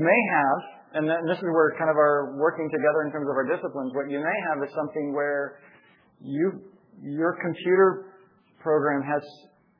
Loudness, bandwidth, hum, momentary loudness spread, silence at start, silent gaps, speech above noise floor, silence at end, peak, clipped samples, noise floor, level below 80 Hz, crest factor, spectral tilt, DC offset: -25 LUFS; 5.4 kHz; none; 12 LU; 0 s; none; 33 dB; 0.45 s; -8 dBFS; under 0.1%; -57 dBFS; -84 dBFS; 18 dB; -9.5 dB/octave; under 0.1%